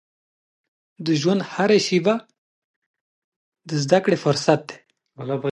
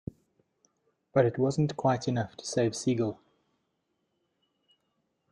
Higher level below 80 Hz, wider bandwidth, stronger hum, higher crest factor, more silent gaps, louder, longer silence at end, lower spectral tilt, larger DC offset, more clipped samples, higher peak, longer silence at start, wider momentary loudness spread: about the same, -68 dBFS vs -66 dBFS; about the same, 11.5 kHz vs 11.5 kHz; neither; about the same, 20 dB vs 22 dB; first, 2.38-2.94 s, 3.01-3.52 s vs none; first, -21 LUFS vs -29 LUFS; second, 0.05 s vs 2.15 s; about the same, -5.5 dB/octave vs -6 dB/octave; neither; neither; first, -2 dBFS vs -10 dBFS; second, 1 s vs 1.15 s; first, 11 LU vs 7 LU